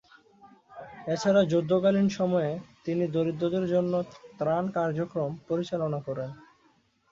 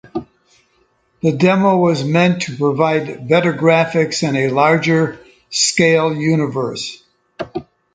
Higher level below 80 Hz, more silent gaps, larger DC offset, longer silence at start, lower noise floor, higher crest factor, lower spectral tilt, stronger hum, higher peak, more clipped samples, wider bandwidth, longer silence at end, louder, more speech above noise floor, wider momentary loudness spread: second, -66 dBFS vs -56 dBFS; neither; neither; first, 0.45 s vs 0.15 s; first, -66 dBFS vs -60 dBFS; about the same, 16 dB vs 16 dB; first, -7 dB/octave vs -5 dB/octave; neither; second, -12 dBFS vs 0 dBFS; neither; second, 7.8 kHz vs 9.6 kHz; first, 0.7 s vs 0.35 s; second, -28 LUFS vs -15 LUFS; second, 39 dB vs 45 dB; about the same, 13 LU vs 15 LU